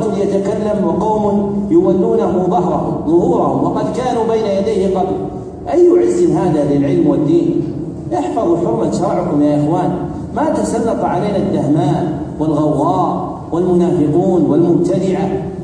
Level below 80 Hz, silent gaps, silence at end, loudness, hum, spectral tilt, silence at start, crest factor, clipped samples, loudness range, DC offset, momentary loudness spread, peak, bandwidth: -40 dBFS; none; 0 s; -15 LUFS; none; -8 dB/octave; 0 s; 12 dB; under 0.1%; 2 LU; under 0.1%; 7 LU; -2 dBFS; 10 kHz